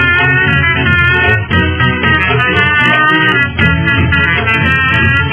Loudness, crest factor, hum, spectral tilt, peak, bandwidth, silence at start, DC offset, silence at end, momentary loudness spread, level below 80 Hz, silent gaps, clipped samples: -9 LUFS; 10 dB; none; -8.5 dB/octave; 0 dBFS; 4 kHz; 0 s; under 0.1%; 0 s; 3 LU; -24 dBFS; none; 0.3%